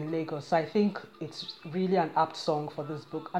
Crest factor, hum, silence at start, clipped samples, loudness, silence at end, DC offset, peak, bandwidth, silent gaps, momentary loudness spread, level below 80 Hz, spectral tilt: 18 dB; none; 0 s; under 0.1%; -31 LUFS; 0 s; under 0.1%; -14 dBFS; 11.5 kHz; none; 12 LU; -76 dBFS; -6.5 dB/octave